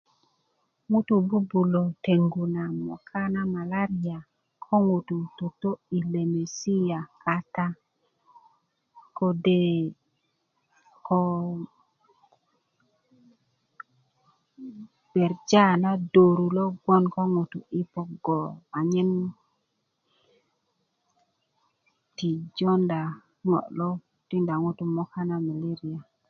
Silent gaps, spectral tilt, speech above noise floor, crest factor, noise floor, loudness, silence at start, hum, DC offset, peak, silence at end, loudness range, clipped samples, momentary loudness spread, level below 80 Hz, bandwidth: none; -7.5 dB/octave; 51 dB; 22 dB; -76 dBFS; -26 LUFS; 0.9 s; none; under 0.1%; -4 dBFS; 0.3 s; 10 LU; under 0.1%; 12 LU; -70 dBFS; 7 kHz